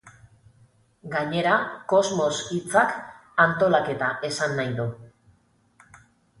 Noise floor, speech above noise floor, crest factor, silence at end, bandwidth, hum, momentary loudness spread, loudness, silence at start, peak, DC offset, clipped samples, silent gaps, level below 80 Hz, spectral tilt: -62 dBFS; 39 dB; 22 dB; 1.35 s; 11.5 kHz; none; 9 LU; -24 LUFS; 0.05 s; -4 dBFS; under 0.1%; under 0.1%; none; -62 dBFS; -4.5 dB/octave